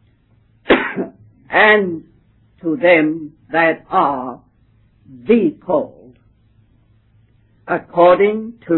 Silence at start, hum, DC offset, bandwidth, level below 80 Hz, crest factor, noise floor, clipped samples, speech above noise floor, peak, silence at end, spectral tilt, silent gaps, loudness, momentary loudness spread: 0.7 s; none; under 0.1%; 4.2 kHz; -54 dBFS; 18 dB; -55 dBFS; under 0.1%; 40 dB; 0 dBFS; 0 s; -9 dB/octave; none; -15 LUFS; 16 LU